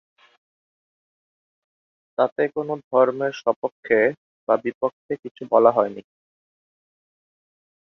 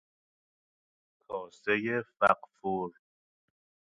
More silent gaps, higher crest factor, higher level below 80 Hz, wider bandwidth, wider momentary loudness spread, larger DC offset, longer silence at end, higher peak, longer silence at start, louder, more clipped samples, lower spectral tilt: first, 2.32-2.36 s, 2.84-2.91 s, 3.56-3.62 s, 3.72-3.83 s, 4.17-4.47 s, 4.75-4.81 s, 4.93-5.09 s, 5.31-5.35 s vs none; about the same, 22 dB vs 24 dB; about the same, -68 dBFS vs -72 dBFS; second, 6.6 kHz vs 9 kHz; about the same, 14 LU vs 14 LU; neither; first, 1.8 s vs 0.95 s; first, -2 dBFS vs -10 dBFS; first, 2.2 s vs 1.3 s; first, -22 LUFS vs -31 LUFS; neither; about the same, -7 dB/octave vs -6.5 dB/octave